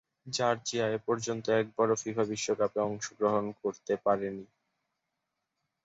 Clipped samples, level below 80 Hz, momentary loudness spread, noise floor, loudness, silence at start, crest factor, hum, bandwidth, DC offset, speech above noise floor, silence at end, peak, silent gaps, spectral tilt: under 0.1%; -72 dBFS; 6 LU; -85 dBFS; -31 LUFS; 0.25 s; 18 dB; none; 8 kHz; under 0.1%; 54 dB; 1.4 s; -14 dBFS; none; -4 dB/octave